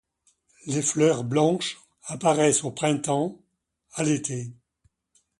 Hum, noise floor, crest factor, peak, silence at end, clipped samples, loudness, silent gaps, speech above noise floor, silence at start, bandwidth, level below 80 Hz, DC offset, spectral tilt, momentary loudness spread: none; -69 dBFS; 18 dB; -8 dBFS; 0.85 s; under 0.1%; -24 LUFS; none; 45 dB; 0.65 s; 11.5 kHz; -66 dBFS; under 0.1%; -4.5 dB/octave; 16 LU